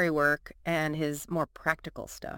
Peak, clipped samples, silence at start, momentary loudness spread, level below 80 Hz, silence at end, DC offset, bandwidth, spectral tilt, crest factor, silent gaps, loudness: -10 dBFS; under 0.1%; 0 s; 9 LU; -56 dBFS; 0 s; under 0.1%; 17 kHz; -5 dB/octave; 22 dB; none; -30 LUFS